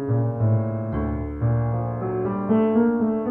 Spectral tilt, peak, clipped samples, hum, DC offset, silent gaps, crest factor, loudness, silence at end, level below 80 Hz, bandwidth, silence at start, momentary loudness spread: -12.5 dB/octave; -8 dBFS; under 0.1%; none; under 0.1%; none; 14 dB; -23 LUFS; 0 s; -38 dBFS; 3.2 kHz; 0 s; 7 LU